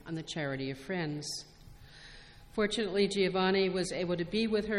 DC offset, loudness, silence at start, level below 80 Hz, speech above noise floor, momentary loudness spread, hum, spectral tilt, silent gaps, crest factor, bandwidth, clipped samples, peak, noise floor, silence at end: under 0.1%; -32 LUFS; 0.05 s; -58 dBFS; 21 dB; 22 LU; none; -5 dB/octave; none; 16 dB; 13 kHz; under 0.1%; -16 dBFS; -53 dBFS; 0 s